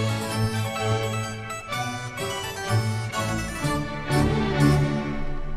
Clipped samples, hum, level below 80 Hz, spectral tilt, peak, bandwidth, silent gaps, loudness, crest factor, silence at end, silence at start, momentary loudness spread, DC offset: under 0.1%; none; -36 dBFS; -5.5 dB/octave; -8 dBFS; 15 kHz; none; -26 LUFS; 18 dB; 0 s; 0 s; 9 LU; under 0.1%